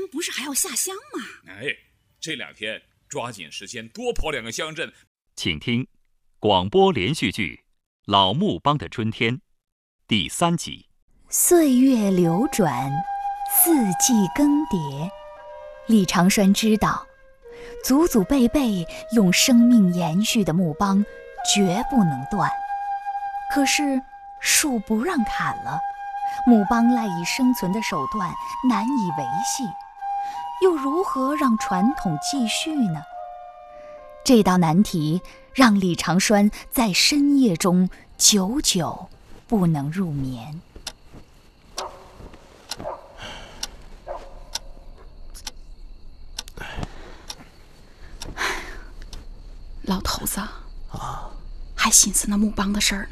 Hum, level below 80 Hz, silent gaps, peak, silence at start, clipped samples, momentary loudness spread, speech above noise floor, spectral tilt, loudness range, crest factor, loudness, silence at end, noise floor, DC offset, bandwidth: none; -42 dBFS; 5.07-5.15 s, 7.86-8.03 s, 9.72-9.99 s, 11.02-11.08 s; 0 dBFS; 0 s; under 0.1%; 20 LU; 30 dB; -4 dB/octave; 17 LU; 22 dB; -21 LUFS; 0 s; -50 dBFS; under 0.1%; 15.5 kHz